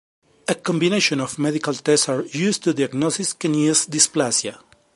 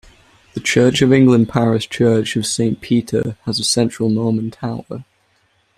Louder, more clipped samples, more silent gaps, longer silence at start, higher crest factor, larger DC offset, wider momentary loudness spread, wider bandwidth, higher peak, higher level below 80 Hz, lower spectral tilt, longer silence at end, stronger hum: second, -20 LUFS vs -16 LUFS; neither; neither; about the same, 0.5 s vs 0.55 s; about the same, 20 dB vs 16 dB; neither; second, 6 LU vs 14 LU; second, 11.5 kHz vs 14 kHz; about the same, -2 dBFS vs -2 dBFS; second, -66 dBFS vs -50 dBFS; second, -3.5 dB/octave vs -5 dB/octave; second, 0.4 s vs 0.75 s; neither